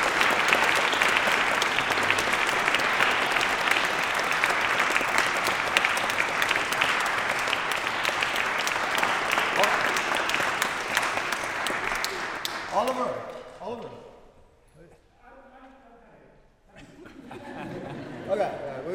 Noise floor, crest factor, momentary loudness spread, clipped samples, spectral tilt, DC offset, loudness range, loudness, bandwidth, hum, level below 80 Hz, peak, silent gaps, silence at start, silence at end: -56 dBFS; 26 dB; 15 LU; under 0.1%; -1.5 dB/octave; under 0.1%; 14 LU; -24 LUFS; over 20 kHz; none; -56 dBFS; 0 dBFS; none; 0 s; 0 s